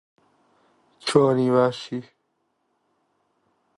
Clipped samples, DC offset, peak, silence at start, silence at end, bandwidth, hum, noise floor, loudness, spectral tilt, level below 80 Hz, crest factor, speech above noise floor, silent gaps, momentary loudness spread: under 0.1%; under 0.1%; -4 dBFS; 1.05 s; 1.75 s; 11.5 kHz; none; -73 dBFS; -22 LUFS; -6 dB/octave; -66 dBFS; 22 dB; 52 dB; none; 15 LU